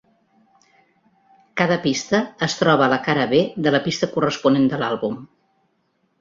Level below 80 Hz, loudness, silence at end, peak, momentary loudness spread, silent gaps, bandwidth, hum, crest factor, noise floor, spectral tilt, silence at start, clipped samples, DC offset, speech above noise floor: -60 dBFS; -20 LUFS; 0.95 s; -2 dBFS; 7 LU; none; 7.6 kHz; none; 20 dB; -67 dBFS; -5 dB/octave; 1.55 s; under 0.1%; under 0.1%; 48 dB